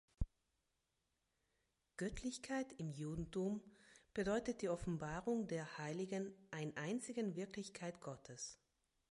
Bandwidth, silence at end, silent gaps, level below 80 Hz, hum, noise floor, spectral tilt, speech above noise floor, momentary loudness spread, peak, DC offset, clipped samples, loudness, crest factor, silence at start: 11.5 kHz; 0.55 s; none; -60 dBFS; none; -87 dBFS; -5.5 dB/octave; 43 dB; 9 LU; -24 dBFS; under 0.1%; under 0.1%; -46 LUFS; 22 dB; 0.2 s